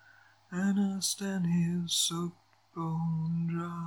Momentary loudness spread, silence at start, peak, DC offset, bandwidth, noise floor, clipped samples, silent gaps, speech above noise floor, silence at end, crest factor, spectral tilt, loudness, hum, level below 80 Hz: 10 LU; 0.5 s; -16 dBFS; under 0.1%; 18 kHz; -61 dBFS; under 0.1%; none; 30 dB; 0 s; 18 dB; -4.5 dB/octave; -32 LUFS; none; -72 dBFS